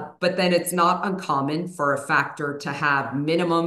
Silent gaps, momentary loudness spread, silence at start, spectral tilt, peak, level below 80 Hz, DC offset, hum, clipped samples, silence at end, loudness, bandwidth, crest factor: none; 6 LU; 0 s; -5 dB/octave; -6 dBFS; -72 dBFS; under 0.1%; none; under 0.1%; 0 s; -23 LUFS; 13 kHz; 16 dB